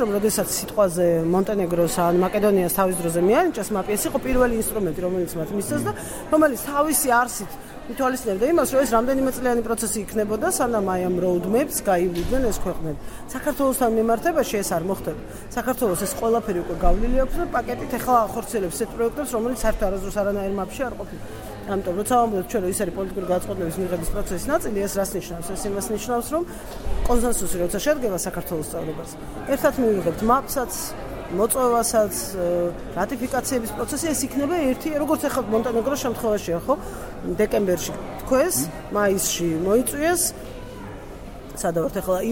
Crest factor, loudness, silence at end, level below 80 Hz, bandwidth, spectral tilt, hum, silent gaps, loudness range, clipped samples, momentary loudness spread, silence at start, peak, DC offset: 18 dB; -23 LUFS; 0 s; -34 dBFS; 17 kHz; -4.5 dB/octave; none; none; 4 LU; under 0.1%; 10 LU; 0 s; -4 dBFS; under 0.1%